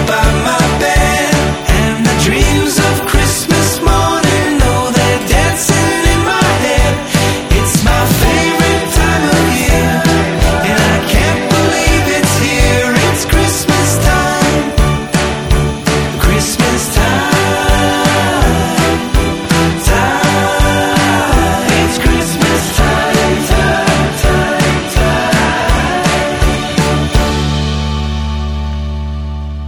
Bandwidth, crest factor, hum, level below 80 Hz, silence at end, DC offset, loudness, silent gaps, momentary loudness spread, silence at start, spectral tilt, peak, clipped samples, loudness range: 18 kHz; 10 dB; none; -18 dBFS; 0 s; under 0.1%; -11 LUFS; none; 3 LU; 0 s; -4.5 dB/octave; 0 dBFS; under 0.1%; 2 LU